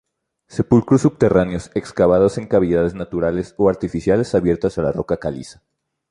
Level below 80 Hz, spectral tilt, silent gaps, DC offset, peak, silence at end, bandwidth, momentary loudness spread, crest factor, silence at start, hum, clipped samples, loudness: -42 dBFS; -8 dB/octave; none; under 0.1%; -2 dBFS; 0.6 s; 11 kHz; 10 LU; 16 dB; 0.5 s; none; under 0.1%; -18 LUFS